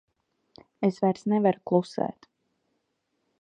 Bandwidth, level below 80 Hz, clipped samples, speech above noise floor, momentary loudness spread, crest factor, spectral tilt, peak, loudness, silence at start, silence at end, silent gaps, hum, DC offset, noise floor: 9.4 kHz; -74 dBFS; under 0.1%; 52 dB; 8 LU; 22 dB; -8 dB/octave; -8 dBFS; -26 LUFS; 0.8 s; 1.3 s; none; none; under 0.1%; -77 dBFS